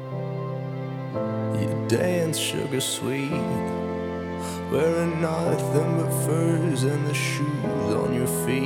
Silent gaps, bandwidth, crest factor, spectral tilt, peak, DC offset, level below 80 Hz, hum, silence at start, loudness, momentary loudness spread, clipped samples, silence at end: none; 17 kHz; 16 dB; -5.5 dB/octave; -8 dBFS; under 0.1%; -54 dBFS; none; 0 s; -25 LUFS; 8 LU; under 0.1%; 0 s